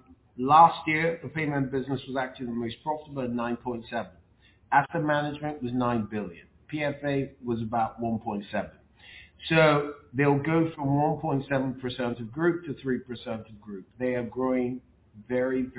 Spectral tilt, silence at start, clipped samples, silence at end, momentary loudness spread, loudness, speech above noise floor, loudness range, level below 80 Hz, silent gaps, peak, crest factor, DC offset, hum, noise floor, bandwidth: -5.5 dB/octave; 0.1 s; under 0.1%; 0 s; 14 LU; -28 LUFS; 33 dB; 6 LU; -58 dBFS; none; -6 dBFS; 22 dB; under 0.1%; none; -60 dBFS; 4 kHz